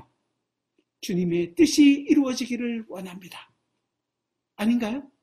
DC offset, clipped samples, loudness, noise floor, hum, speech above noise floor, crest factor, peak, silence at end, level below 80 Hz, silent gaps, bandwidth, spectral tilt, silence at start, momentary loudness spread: under 0.1%; under 0.1%; -23 LUFS; -83 dBFS; none; 60 dB; 18 dB; -8 dBFS; 0.15 s; -64 dBFS; none; 14.5 kHz; -5 dB/octave; 1.05 s; 20 LU